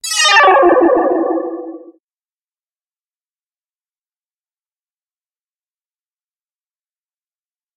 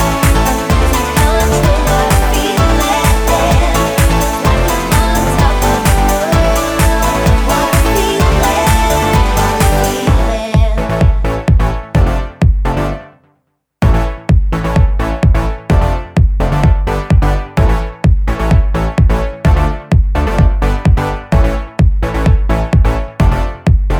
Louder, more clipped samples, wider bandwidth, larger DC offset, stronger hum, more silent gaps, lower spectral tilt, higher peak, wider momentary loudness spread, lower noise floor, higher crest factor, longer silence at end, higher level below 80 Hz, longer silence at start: first, -10 LUFS vs -13 LUFS; neither; second, 14.5 kHz vs over 20 kHz; neither; neither; neither; second, -0.5 dB/octave vs -5.5 dB/octave; about the same, 0 dBFS vs 0 dBFS; first, 19 LU vs 3 LU; first, under -90 dBFS vs -62 dBFS; first, 18 dB vs 10 dB; first, 6 s vs 0 s; second, -60 dBFS vs -14 dBFS; about the same, 0.05 s vs 0 s